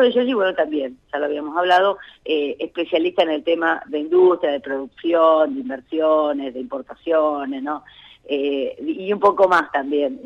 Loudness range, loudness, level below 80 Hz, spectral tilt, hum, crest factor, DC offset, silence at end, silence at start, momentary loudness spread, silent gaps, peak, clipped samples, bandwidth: 4 LU; -20 LUFS; -62 dBFS; -5.5 dB/octave; none; 14 dB; under 0.1%; 0.05 s; 0 s; 12 LU; none; -4 dBFS; under 0.1%; 7.8 kHz